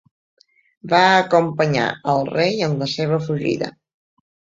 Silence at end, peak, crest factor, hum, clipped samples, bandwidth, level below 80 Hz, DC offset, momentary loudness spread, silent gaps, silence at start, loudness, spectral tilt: 0.9 s; -2 dBFS; 18 dB; none; under 0.1%; 7.6 kHz; -60 dBFS; under 0.1%; 8 LU; none; 0.85 s; -18 LUFS; -5.5 dB/octave